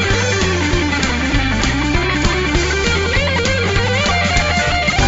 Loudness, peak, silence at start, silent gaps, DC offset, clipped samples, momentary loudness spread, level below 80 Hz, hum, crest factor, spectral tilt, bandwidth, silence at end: -15 LUFS; -2 dBFS; 0 s; none; under 0.1%; under 0.1%; 2 LU; -24 dBFS; none; 14 dB; -4 dB/octave; 8 kHz; 0 s